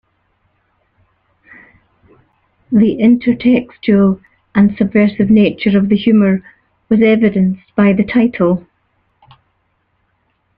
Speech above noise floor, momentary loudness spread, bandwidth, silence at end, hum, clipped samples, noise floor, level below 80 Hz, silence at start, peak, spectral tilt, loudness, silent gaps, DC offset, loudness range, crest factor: 52 dB; 6 LU; 4.8 kHz; 2 s; none; under 0.1%; -63 dBFS; -48 dBFS; 2.7 s; 0 dBFS; -10.5 dB/octave; -13 LUFS; none; under 0.1%; 5 LU; 14 dB